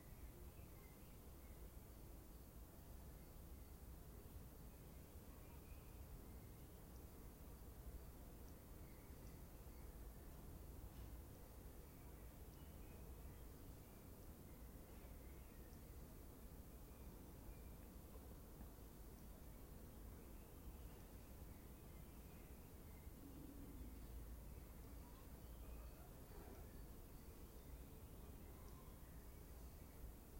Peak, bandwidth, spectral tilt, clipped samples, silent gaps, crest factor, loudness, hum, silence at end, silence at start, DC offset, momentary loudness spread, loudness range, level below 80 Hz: -44 dBFS; 16.5 kHz; -5.5 dB/octave; under 0.1%; none; 14 dB; -60 LUFS; none; 0 s; 0 s; under 0.1%; 2 LU; 1 LU; -60 dBFS